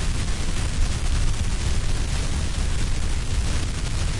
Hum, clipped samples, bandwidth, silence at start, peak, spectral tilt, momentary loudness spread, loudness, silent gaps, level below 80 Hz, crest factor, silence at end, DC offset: none; under 0.1%; 11.5 kHz; 0 s; -10 dBFS; -4 dB/octave; 2 LU; -27 LUFS; none; -24 dBFS; 12 dB; 0 s; under 0.1%